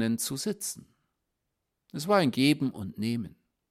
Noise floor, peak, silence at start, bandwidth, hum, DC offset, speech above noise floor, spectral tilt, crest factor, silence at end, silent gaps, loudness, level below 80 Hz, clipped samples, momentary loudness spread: -83 dBFS; -12 dBFS; 0 s; 16 kHz; none; under 0.1%; 54 dB; -4.5 dB/octave; 20 dB; 0.4 s; none; -29 LUFS; -68 dBFS; under 0.1%; 16 LU